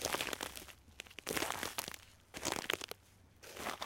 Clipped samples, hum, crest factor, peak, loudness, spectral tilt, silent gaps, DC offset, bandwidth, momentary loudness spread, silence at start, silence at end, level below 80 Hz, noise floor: under 0.1%; none; 28 dB; -14 dBFS; -41 LUFS; -1.5 dB/octave; none; under 0.1%; 17 kHz; 15 LU; 0 s; 0 s; -64 dBFS; -64 dBFS